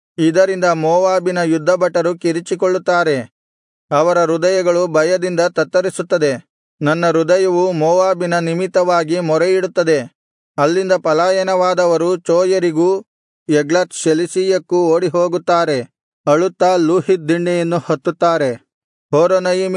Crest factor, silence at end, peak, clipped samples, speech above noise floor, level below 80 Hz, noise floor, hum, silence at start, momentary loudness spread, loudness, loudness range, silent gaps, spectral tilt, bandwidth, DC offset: 14 dB; 0 s; -2 dBFS; under 0.1%; over 76 dB; -70 dBFS; under -90 dBFS; none; 0.2 s; 5 LU; -15 LUFS; 1 LU; 3.31-3.88 s, 6.50-6.78 s, 10.15-10.54 s, 13.08-13.46 s, 16.03-16.24 s, 18.74-19.09 s; -5.5 dB/octave; 11 kHz; under 0.1%